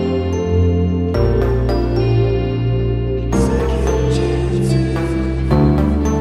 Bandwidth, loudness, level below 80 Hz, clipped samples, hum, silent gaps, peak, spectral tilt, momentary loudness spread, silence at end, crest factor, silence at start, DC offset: 12 kHz; -17 LUFS; -22 dBFS; under 0.1%; none; none; -2 dBFS; -7.5 dB/octave; 4 LU; 0 s; 14 dB; 0 s; under 0.1%